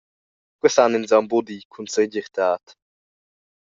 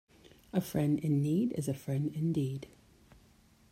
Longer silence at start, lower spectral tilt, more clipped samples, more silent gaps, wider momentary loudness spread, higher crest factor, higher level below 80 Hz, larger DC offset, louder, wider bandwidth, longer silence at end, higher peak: about the same, 0.65 s vs 0.55 s; second, -3.5 dB/octave vs -8 dB/octave; neither; first, 1.65-1.70 s vs none; first, 11 LU vs 7 LU; about the same, 20 dB vs 18 dB; second, -70 dBFS vs -64 dBFS; neither; first, -21 LUFS vs -33 LUFS; second, 7.8 kHz vs 16 kHz; about the same, 1.1 s vs 1.05 s; first, -2 dBFS vs -16 dBFS